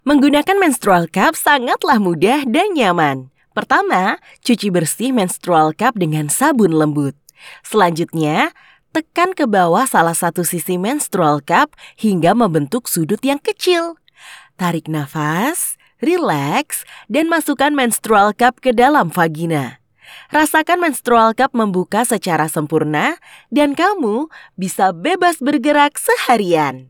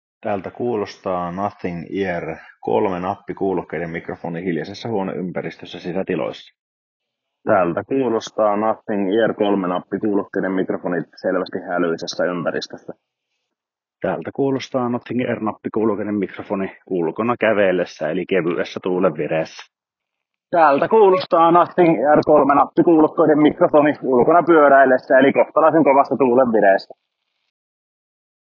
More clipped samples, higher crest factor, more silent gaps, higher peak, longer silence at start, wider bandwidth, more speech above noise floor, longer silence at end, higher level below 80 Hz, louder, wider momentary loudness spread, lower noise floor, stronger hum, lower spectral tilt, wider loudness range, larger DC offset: neither; about the same, 14 dB vs 18 dB; second, none vs 6.59-7.00 s; about the same, -2 dBFS vs 0 dBFS; second, 0.05 s vs 0.25 s; first, over 20 kHz vs 7 kHz; second, 26 dB vs 66 dB; second, 0.05 s vs 1.65 s; first, -56 dBFS vs -62 dBFS; first, -15 LUFS vs -18 LUFS; second, 8 LU vs 13 LU; second, -41 dBFS vs -84 dBFS; neither; about the same, -4.5 dB/octave vs -5 dB/octave; second, 3 LU vs 11 LU; neither